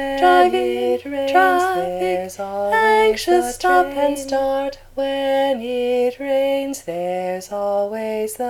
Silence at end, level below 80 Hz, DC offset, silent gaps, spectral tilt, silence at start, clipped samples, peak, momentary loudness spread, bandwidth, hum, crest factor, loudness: 0 s; -48 dBFS; under 0.1%; none; -3.5 dB/octave; 0 s; under 0.1%; -2 dBFS; 10 LU; 18 kHz; none; 16 dB; -19 LUFS